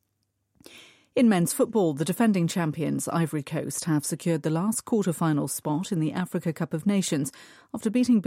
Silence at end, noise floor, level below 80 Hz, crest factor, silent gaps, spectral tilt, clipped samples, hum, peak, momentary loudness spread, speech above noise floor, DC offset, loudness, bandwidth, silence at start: 0 s; -76 dBFS; -68 dBFS; 14 dB; none; -5.5 dB/octave; under 0.1%; none; -12 dBFS; 7 LU; 51 dB; under 0.1%; -26 LUFS; 16 kHz; 0.75 s